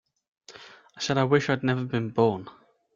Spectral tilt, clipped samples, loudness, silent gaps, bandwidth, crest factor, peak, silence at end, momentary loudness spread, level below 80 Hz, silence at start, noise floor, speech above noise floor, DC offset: -6 dB/octave; under 0.1%; -26 LUFS; none; 7.6 kHz; 20 dB; -8 dBFS; 0.45 s; 23 LU; -64 dBFS; 0.5 s; -49 dBFS; 24 dB; under 0.1%